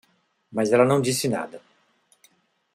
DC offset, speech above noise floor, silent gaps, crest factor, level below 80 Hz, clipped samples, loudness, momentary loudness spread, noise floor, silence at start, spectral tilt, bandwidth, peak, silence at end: under 0.1%; 42 dB; none; 22 dB; -66 dBFS; under 0.1%; -22 LUFS; 14 LU; -64 dBFS; 0.5 s; -5 dB/octave; 15.5 kHz; -4 dBFS; 1.15 s